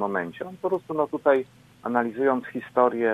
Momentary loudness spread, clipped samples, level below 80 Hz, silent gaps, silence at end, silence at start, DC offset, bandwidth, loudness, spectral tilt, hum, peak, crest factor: 10 LU; under 0.1%; -70 dBFS; none; 0 s; 0 s; under 0.1%; 13 kHz; -25 LUFS; -7.5 dB/octave; none; -6 dBFS; 20 dB